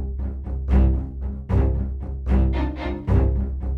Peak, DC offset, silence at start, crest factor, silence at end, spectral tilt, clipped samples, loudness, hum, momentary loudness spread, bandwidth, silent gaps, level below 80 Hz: -6 dBFS; under 0.1%; 0 s; 14 dB; 0 s; -10 dB/octave; under 0.1%; -24 LUFS; none; 10 LU; 4.3 kHz; none; -22 dBFS